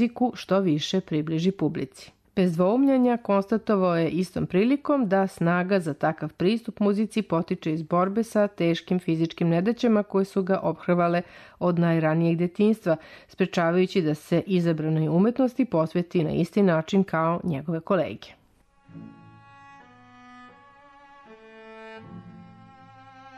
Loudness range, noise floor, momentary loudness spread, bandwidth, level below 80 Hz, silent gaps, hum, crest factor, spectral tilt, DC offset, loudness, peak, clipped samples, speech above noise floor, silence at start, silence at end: 3 LU; -61 dBFS; 7 LU; 13 kHz; -62 dBFS; none; none; 12 dB; -7.5 dB/octave; under 0.1%; -24 LUFS; -12 dBFS; under 0.1%; 37 dB; 0 s; 0 s